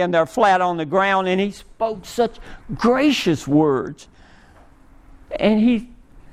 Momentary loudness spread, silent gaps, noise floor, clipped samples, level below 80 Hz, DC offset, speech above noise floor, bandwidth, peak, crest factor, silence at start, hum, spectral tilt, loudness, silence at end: 9 LU; none; -48 dBFS; under 0.1%; -46 dBFS; under 0.1%; 29 dB; 15 kHz; -4 dBFS; 16 dB; 0 s; none; -5.5 dB/octave; -19 LUFS; 0.1 s